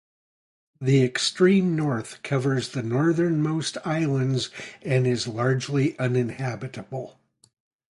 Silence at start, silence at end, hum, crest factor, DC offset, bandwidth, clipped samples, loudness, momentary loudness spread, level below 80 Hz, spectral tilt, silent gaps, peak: 0.8 s; 0.8 s; none; 16 dB; under 0.1%; 11.5 kHz; under 0.1%; -24 LUFS; 13 LU; -62 dBFS; -6 dB/octave; none; -8 dBFS